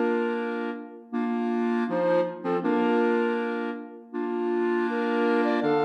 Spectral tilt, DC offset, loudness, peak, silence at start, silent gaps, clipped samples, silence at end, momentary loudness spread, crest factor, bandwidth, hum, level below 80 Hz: -7.5 dB/octave; under 0.1%; -26 LUFS; -12 dBFS; 0 s; none; under 0.1%; 0 s; 10 LU; 14 dB; 6.4 kHz; none; -86 dBFS